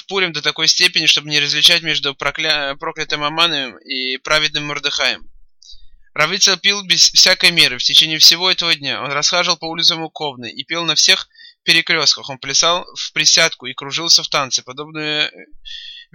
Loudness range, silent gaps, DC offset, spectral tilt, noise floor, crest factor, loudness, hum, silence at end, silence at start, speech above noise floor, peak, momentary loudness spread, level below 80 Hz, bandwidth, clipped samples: 7 LU; none; under 0.1%; -0.5 dB/octave; -39 dBFS; 16 dB; -13 LUFS; none; 0.1 s; 0.1 s; 22 dB; 0 dBFS; 14 LU; -50 dBFS; 16.5 kHz; under 0.1%